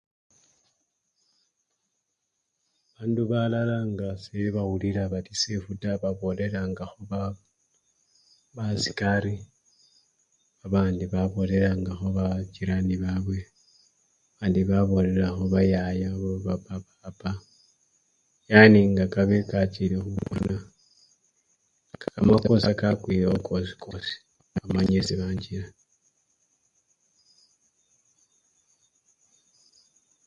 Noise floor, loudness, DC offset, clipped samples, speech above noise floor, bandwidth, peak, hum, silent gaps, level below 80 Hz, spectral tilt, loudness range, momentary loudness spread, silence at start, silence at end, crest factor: -79 dBFS; -25 LUFS; under 0.1%; under 0.1%; 55 dB; 7.8 kHz; 0 dBFS; none; none; -46 dBFS; -6.5 dB/octave; 10 LU; 14 LU; 3 s; 4.6 s; 26 dB